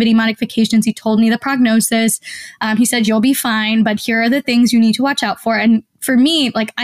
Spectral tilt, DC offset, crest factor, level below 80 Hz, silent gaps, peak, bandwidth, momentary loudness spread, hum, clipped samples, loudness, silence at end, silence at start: -3.5 dB/octave; 0.1%; 10 dB; -58 dBFS; none; -4 dBFS; 16 kHz; 5 LU; none; under 0.1%; -14 LUFS; 0 s; 0 s